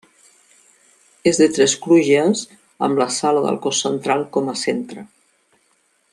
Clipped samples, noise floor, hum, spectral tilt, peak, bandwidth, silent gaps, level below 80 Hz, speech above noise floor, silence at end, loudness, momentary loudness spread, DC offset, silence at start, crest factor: under 0.1%; -62 dBFS; none; -4 dB/octave; -2 dBFS; 12 kHz; none; -64 dBFS; 45 dB; 1.05 s; -18 LUFS; 10 LU; under 0.1%; 1.25 s; 18 dB